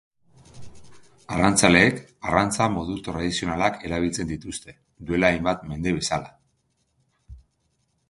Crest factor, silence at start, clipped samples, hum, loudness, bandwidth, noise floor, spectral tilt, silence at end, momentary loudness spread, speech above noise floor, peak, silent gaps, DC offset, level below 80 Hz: 26 dB; 0.55 s; under 0.1%; none; -23 LUFS; 12 kHz; -70 dBFS; -4 dB/octave; 0.7 s; 14 LU; 47 dB; 0 dBFS; none; under 0.1%; -46 dBFS